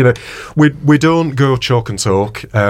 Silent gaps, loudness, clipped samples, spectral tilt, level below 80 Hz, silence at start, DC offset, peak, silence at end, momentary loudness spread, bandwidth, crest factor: none; -13 LUFS; under 0.1%; -6 dB/octave; -42 dBFS; 0 s; under 0.1%; -2 dBFS; 0 s; 7 LU; 15 kHz; 12 dB